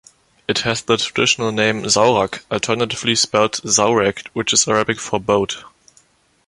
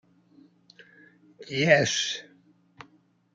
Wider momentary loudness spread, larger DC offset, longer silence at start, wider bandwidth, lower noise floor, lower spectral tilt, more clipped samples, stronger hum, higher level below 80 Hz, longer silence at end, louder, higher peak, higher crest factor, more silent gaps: second, 8 LU vs 14 LU; neither; second, 0.5 s vs 1.4 s; first, 11.5 kHz vs 9.4 kHz; second, -56 dBFS vs -62 dBFS; about the same, -2.5 dB/octave vs -3.5 dB/octave; neither; neither; first, -52 dBFS vs -72 dBFS; second, 0.8 s vs 1.15 s; first, -17 LUFS vs -24 LUFS; first, 0 dBFS vs -4 dBFS; second, 18 dB vs 26 dB; neither